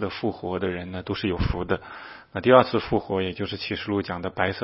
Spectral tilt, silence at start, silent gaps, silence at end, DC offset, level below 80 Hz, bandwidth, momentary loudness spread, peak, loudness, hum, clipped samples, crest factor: -10 dB/octave; 0 s; none; 0 s; under 0.1%; -42 dBFS; 5.8 kHz; 13 LU; 0 dBFS; -25 LUFS; none; under 0.1%; 24 dB